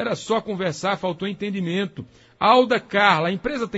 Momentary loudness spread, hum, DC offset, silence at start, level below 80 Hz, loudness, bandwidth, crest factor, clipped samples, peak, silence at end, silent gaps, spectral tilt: 10 LU; none; under 0.1%; 0 s; -56 dBFS; -21 LUFS; 8 kHz; 20 dB; under 0.1%; -2 dBFS; 0 s; none; -5 dB/octave